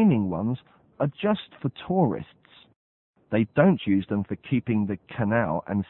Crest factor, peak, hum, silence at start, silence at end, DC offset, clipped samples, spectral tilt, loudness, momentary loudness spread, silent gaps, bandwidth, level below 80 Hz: 20 dB; -4 dBFS; none; 0 s; 0.05 s; under 0.1%; under 0.1%; -12 dB/octave; -26 LUFS; 11 LU; 2.76-3.13 s; 4.1 kHz; -58 dBFS